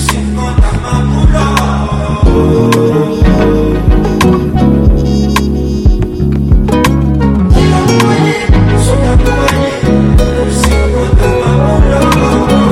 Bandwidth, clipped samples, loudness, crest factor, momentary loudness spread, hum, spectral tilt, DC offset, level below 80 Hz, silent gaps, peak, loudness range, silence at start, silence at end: 14.5 kHz; under 0.1%; -10 LUFS; 8 dB; 4 LU; none; -6.5 dB/octave; under 0.1%; -12 dBFS; none; 0 dBFS; 1 LU; 0 s; 0 s